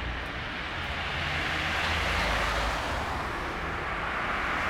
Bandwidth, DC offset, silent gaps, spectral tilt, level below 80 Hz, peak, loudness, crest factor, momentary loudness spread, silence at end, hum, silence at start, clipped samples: 17.5 kHz; under 0.1%; none; -4 dB/octave; -40 dBFS; -16 dBFS; -29 LUFS; 14 dB; 6 LU; 0 s; none; 0 s; under 0.1%